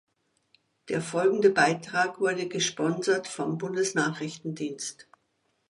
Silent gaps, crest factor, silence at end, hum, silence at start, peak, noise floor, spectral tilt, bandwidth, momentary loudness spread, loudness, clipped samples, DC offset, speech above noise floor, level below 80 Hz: none; 20 dB; 0.7 s; none; 0.85 s; -8 dBFS; -74 dBFS; -4 dB/octave; 11.5 kHz; 12 LU; -27 LUFS; under 0.1%; under 0.1%; 47 dB; -74 dBFS